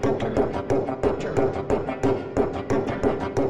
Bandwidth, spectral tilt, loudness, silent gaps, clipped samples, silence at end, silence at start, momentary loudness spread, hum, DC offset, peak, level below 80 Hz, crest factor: 11 kHz; -7.5 dB/octave; -25 LUFS; none; under 0.1%; 0 s; 0 s; 2 LU; none; 0.9%; -8 dBFS; -42 dBFS; 16 dB